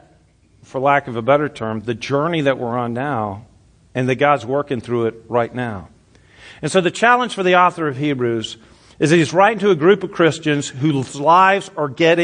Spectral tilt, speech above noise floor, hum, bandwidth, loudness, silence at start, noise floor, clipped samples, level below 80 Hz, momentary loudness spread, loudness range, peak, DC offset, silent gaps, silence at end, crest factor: -5.5 dB/octave; 37 dB; none; 10.5 kHz; -17 LUFS; 0.75 s; -53 dBFS; under 0.1%; -58 dBFS; 11 LU; 5 LU; 0 dBFS; under 0.1%; none; 0 s; 18 dB